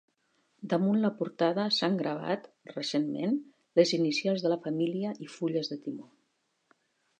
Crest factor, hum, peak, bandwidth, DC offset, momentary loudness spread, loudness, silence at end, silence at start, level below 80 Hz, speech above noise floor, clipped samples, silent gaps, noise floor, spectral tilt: 22 dB; none; -10 dBFS; 9.4 kHz; under 0.1%; 10 LU; -30 LUFS; 1.2 s; 0.6 s; -84 dBFS; 47 dB; under 0.1%; none; -76 dBFS; -5.5 dB/octave